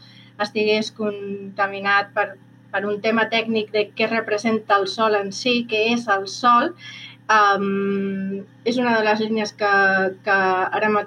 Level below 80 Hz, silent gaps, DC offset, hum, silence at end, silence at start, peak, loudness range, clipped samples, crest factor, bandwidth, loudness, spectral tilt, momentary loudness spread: -78 dBFS; none; under 0.1%; none; 0 s; 0.2 s; -6 dBFS; 3 LU; under 0.1%; 16 dB; 10.5 kHz; -20 LUFS; -4.5 dB/octave; 11 LU